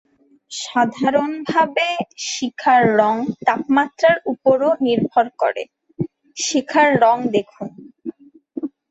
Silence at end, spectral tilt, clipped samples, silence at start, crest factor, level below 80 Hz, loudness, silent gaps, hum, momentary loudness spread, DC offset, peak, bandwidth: 0.25 s; -4 dB/octave; under 0.1%; 0.5 s; 16 dB; -62 dBFS; -18 LUFS; none; none; 18 LU; under 0.1%; -2 dBFS; 8.2 kHz